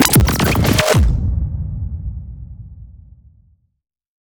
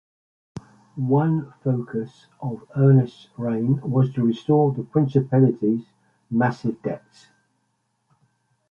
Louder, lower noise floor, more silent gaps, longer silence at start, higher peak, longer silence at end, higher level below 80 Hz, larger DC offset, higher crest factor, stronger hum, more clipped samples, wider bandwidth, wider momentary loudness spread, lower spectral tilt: first, -16 LUFS vs -22 LUFS; second, -54 dBFS vs -72 dBFS; neither; second, 0 s vs 0.55 s; first, 0 dBFS vs -6 dBFS; second, 1.4 s vs 1.75 s; first, -24 dBFS vs -62 dBFS; neither; about the same, 18 dB vs 18 dB; neither; neither; first, over 20 kHz vs 6.8 kHz; first, 22 LU vs 17 LU; second, -4.5 dB/octave vs -10 dB/octave